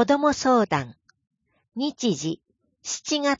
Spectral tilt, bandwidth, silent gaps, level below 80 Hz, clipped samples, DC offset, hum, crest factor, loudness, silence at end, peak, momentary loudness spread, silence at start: -4 dB/octave; 7.8 kHz; none; -60 dBFS; under 0.1%; under 0.1%; none; 16 dB; -24 LUFS; 0.05 s; -8 dBFS; 17 LU; 0 s